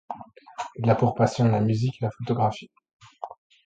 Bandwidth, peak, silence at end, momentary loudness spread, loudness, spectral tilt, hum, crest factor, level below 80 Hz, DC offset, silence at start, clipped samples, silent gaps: 8.6 kHz; -8 dBFS; 0.35 s; 19 LU; -24 LUFS; -7.5 dB/octave; none; 18 dB; -58 dBFS; under 0.1%; 0.1 s; under 0.1%; 2.93-2.99 s